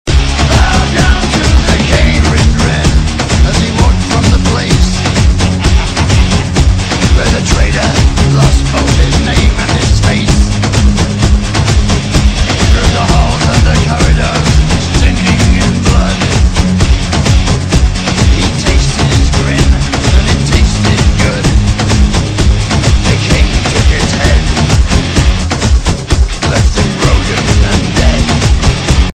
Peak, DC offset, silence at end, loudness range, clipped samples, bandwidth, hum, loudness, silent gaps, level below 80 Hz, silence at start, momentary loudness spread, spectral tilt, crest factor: 0 dBFS; under 0.1%; 0.05 s; 1 LU; 1%; 10.5 kHz; none; -10 LUFS; none; -12 dBFS; 0.05 s; 2 LU; -5 dB/octave; 8 dB